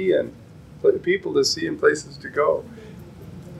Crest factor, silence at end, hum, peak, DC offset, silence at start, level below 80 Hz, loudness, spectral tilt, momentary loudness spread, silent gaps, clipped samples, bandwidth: 18 dB; 0 s; none; -4 dBFS; under 0.1%; 0 s; -54 dBFS; -22 LUFS; -4 dB/octave; 21 LU; none; under 0.1%; 13 kHz